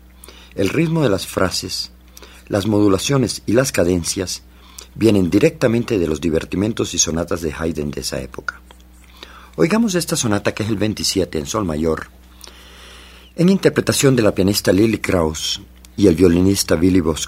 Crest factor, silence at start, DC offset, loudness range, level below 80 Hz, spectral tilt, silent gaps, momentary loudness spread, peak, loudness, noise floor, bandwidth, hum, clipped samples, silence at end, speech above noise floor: 18 dB; 0.35 s; under 0.1%; 6 LU; -42 dBFS; -5 dB/octave; none; 12 LU; 0 dBFS; -18 LUFS; -44 dBFS; 16 kHz; none; under 0.1%; 0 s; 27 dB